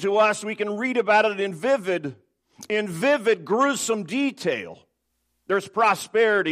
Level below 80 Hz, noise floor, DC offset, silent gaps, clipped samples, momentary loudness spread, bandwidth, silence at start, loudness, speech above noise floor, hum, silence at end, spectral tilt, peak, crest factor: -76 dBFS; -74 dBFS; under 0.1%; none; under 0.1%; 8 LU; 15 kHz; 0 s; -23 LUFS; 52 dB; none; 0 s; -4 dB/octave; -6 dBFS; 18 dB